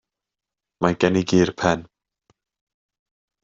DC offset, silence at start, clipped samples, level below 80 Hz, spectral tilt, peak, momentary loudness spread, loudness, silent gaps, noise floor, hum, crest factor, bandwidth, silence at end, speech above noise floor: under 0.1%; 0.8 s; under 0.1%; -56 dBFS; -6 dB/octave; -4 dBFS; 6 LU; -21 LUFS; none; -87 dBFS; none; 22 dB; 7.6 kHz; 1.6 s; 68 dB